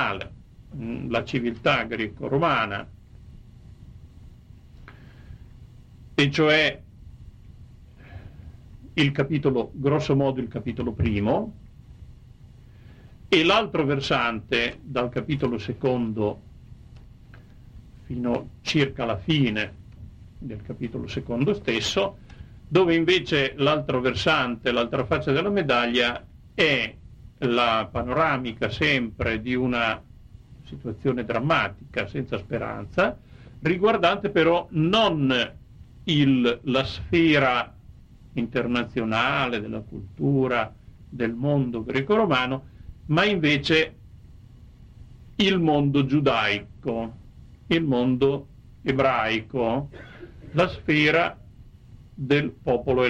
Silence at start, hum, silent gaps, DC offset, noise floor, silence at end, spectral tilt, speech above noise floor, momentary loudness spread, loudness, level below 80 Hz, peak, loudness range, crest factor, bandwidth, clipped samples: 0 s; none; none; under 0.1%; -48 dBFS; 0 s; -6 dB/octave; 24 dB; 14 LU; -24 LUFS; -48 dBFS; -6 dBFS; 5 LU; 18 dB; 9.2 kHz; under 0.1%